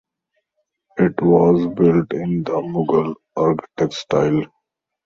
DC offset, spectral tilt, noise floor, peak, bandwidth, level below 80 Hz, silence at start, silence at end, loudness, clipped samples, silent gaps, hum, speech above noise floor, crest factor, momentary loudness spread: under 0.1%; -8 dB/octave; -76 dBFS; -2 dBFS; 7.2 kHz; -52 dBFS; 0.95 s; 0.6 s; -18 LUFS; under 0.1%; none; none; 58 dB; 16 dB; 9 LU